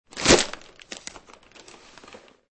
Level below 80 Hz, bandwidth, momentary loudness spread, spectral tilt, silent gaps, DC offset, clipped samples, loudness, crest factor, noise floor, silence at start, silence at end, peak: -44 dBFS; 8.8 kHz; 23 LU; -2.5 dB/octave; none; under 0.1%; under 0.1%; -19 LUFS; 26 dB; -50 dBFS; 0.15 s; 0.35 s; -2 dBFS